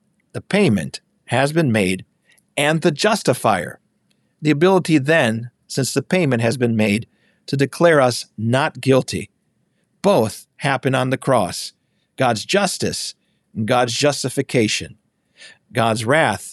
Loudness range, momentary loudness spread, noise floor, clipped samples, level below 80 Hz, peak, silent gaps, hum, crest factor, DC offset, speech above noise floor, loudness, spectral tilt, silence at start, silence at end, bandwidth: 3 LU; 12 LU; -66 dBFS; under 0.1%; -58 dBFS; -4 dBFS; none; none; 16 dB; under 0.1%; 48 dB; -19 LUFS; -5 dB/octave; 0.35 s; 0 s; 13.5 kHz